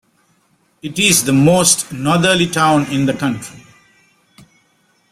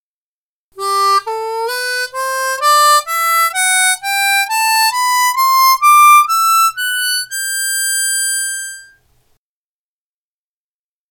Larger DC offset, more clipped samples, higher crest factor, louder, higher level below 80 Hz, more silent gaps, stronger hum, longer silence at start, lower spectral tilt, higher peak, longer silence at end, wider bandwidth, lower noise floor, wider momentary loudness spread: neither; neither; about the same, 16 dB vs 14 dB; about the same, -13 LUFS vs -12 LUFS; first, -50 dBFS vs -66 dBFS; neither; neither; about the same, 0.85 s vs 0.75 s; first, -3.5 dB/octave vs 3.5 dB/octave; about the same, 0 dBFS vs 0 dBFS; second, 1.55 s vs 2.3 s; second, 16 kHz vs 19.5 kHz; second, -59 dBFS vs under -90 dBFS; first, 15 LU vs 10 LU